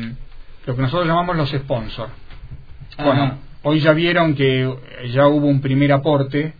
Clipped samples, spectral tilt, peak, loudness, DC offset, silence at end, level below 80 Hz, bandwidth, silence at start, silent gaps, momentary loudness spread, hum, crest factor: under 0.1%; -9.5 dB/octave; 0 dBFS; -18 LUFS; 0.6%; 0.1 s; -38 dBFS; 5 kHz; 0 s; none; 16 LU; none; 18 dB